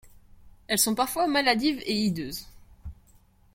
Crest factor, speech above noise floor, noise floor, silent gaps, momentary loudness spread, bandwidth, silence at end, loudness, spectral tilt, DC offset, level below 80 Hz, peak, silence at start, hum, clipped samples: 22 dB; 33 dB; -59 dBFS; none; 24 LU; 16.5 kHz; 0.6 s; -25 LUFS; -3 dB/octave; under 0.1%; -52 dBFS; -8 dBFS; 0.05 s; none; under 0.1%